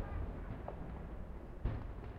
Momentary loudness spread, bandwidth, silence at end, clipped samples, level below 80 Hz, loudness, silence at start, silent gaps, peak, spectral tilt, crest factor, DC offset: 6 LU; 5.4 kHz; 0 s; under 0.1%; -46 dBFS; -46 LUFS; 0 s; none; -26 dBFS; -9 dB/octave; 18 dB; under 0.1%